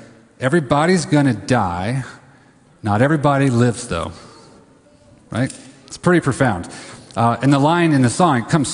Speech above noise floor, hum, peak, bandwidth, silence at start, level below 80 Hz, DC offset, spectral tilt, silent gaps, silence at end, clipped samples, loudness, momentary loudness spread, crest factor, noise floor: 33 dB; none; 0 dBFS; 11 kHz; 0 s; -44 dBFS; under 0.1%; -6 dB/octave; none; 0 s; under 0.1%; -17 LUFS; 14 LU; 18 dB; -50 dBFS